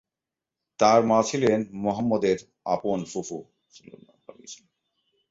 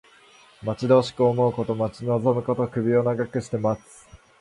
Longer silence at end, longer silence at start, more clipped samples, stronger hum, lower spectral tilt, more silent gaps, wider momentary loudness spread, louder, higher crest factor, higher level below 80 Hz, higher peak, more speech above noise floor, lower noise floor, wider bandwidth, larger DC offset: first, 0.75 s vs 0.25 s; first, 0.8 s vs 0.6 s; neither; neither; second, -5 dB/octave vs -7.5 dB/octave; neither; first, 23 LU vs 8 LU; about the same, -24 LUFS vs -23 LUFS; about the same, 20 dB vs 18 dB; second, -64 dBFS vs -56 dBFS; about the same, -6 dBFS vs -6 dBFS; first, 64 dB vs 30 dB; first, -89 dBFS vs -53 dBFS; second, 8 kHz vs 11.5 kHz; neither